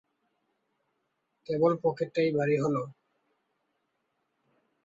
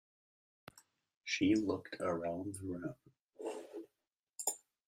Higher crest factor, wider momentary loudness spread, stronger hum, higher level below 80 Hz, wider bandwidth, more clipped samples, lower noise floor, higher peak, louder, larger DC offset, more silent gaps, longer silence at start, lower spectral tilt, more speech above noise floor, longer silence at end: about the same, 18 dB vs 22 dB; second, 8 LU vs 26 LU; neither; about the same, -72 dBFS vs -76 dBFS; second, 7.8 kHz vs 15.5 kHz; neither; second, -79 dBFS vs -89 dBFS; first, -14 dBFS vs -20 dBFS; first, -28 LUFS vs -39 LUFS; neither; second, none vs 1.17-1.21 s, 3.23-3.29 s, 4.23-4.27 s; first, 1.5 s vs 0.75 s; first, -7.5 dB/octave vs -4 dB/octave; about the same, 52 dB vs 52 dB; first, 1.95 s vs 0.3 s